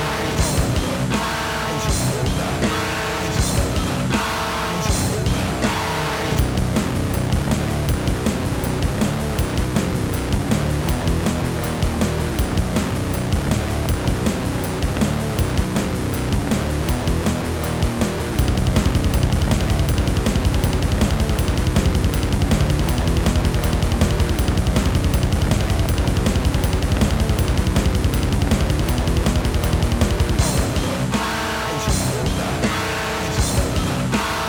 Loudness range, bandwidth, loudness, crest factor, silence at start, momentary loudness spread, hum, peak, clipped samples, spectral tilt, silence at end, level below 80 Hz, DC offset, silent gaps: 2 LU; over 20 kHz; -20 LUFS; 16 dB; 0 s; 3 LU; none; -2 dBFS; under 0.1%; -5 dB/octave; 0 s; -24 dBFS; under 0.1%; none